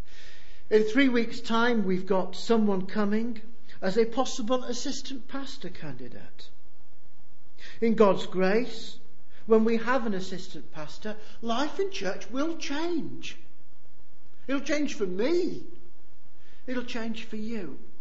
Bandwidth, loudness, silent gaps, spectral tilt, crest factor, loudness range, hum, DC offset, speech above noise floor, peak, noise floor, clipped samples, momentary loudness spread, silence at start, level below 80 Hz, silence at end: 8 kHz; -28 LUFS; none; -5 dB/octave; 22 dB; 7 LU; none; 5%; 34 dB; -6 dBFS; -62 dBFS; under 0.1%; 19 LU; 0.1 s; -58 dBFS; 0.15 s